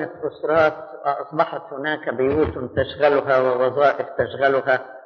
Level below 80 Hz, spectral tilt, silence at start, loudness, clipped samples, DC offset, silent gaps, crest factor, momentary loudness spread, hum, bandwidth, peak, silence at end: -48 dBFS; -4 dB/octave; 0 s; -21 LUFS; under 0.1%; under 0.1%; none; 16 dB; 8 LU; none; 6.6 kHz; -6 dBFS; 0.05 s